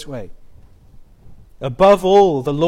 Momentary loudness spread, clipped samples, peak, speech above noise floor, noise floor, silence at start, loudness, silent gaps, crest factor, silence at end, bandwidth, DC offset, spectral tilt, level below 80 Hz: 20 LU; under 0.1%; -2 dBFS; 28 dB; -43 dBFS; 0 s; -13 LUFS; none; 16 dB; 0 s; 14 kHz; under 0.1%; -6.5 dB/octave; -40 dBFS